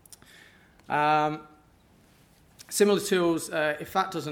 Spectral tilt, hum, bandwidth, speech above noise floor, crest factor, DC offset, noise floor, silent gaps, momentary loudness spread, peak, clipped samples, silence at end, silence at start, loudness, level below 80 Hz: -4 dB/octave; none; 17.5 kHz; 34 dB; 20 dB; under 0.1%; -59 dBFS; none; 8 LU; -8 dBFS; under 0.1%; 0 s; 0.9 s; -26 LUFS; -66 dBFS